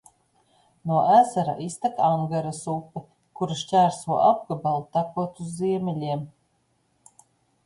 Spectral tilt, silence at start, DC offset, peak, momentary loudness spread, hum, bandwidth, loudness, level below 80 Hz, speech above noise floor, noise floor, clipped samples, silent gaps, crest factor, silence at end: -6.5 dB/octave; 0.85 s; under 0.1%; -6 dBFS; 14 LU; none; 11.5 kHz; -24 LUFS; -66 dBFS; 45 dB; -69 dBFS; under 0.1%; none; 20 dB; 1.35 s